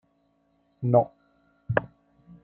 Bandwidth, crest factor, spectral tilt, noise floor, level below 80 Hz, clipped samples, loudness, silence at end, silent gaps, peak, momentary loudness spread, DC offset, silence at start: 3.4 kHz; 24 dB; -11 dB/octave; -69 dBFS; -60 dBFS; under 0.1%; -26 LUFS; 0.6 s; none; -6 dBFS; 10 LU; under 0.1%; 0.8 s